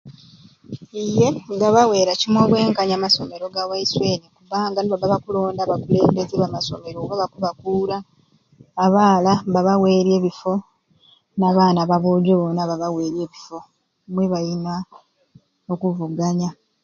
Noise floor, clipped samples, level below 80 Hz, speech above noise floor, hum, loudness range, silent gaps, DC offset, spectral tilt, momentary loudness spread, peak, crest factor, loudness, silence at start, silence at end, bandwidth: -56 dBFS; under 0.1%; -56 dBFS; 37 dB; none; 7 LU; none; under 0.1%; -6 dB/octave; 13 LU; 0 dBFS; 20 dB; -19 LUFS; 0.05 s; 0.3 s; 7.4 kHz